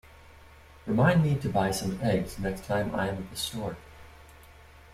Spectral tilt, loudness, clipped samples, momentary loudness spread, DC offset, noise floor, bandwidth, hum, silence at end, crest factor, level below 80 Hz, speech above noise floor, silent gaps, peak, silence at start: -6 dB/octave; -28 LUFS; under 0.1%; 13 LU; under 0.1%; -52 dBFS; 16 kHz; none; 0.15 s; 20 dB; -50 dBFS; 25 dB; none; -8 dBFS; 0.35 s